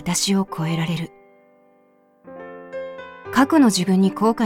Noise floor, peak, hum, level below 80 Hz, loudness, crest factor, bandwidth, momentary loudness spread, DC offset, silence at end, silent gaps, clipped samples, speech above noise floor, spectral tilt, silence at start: -57 dBFS; -2 dBFS; 50 Hz at -60 dBFS; -56 dBFS; -19 LUFS; 20 dB; 16.5 kHz; 21 LU; under 0.1%; 0 s; none; under 0.1%; 39 dB; -5 dB/octave; 0 s